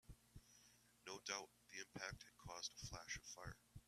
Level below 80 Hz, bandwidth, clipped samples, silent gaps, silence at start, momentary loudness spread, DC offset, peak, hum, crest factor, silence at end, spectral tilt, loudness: -70 dBFS; 14.5 kHz; under 0.1%; none; 0.05 s; 17 LU; under 0.1%; -30 dBFS; 60 Hz at -80 dBFS; 26 dB; 0 s; -2 dB/octave; -53 LUFS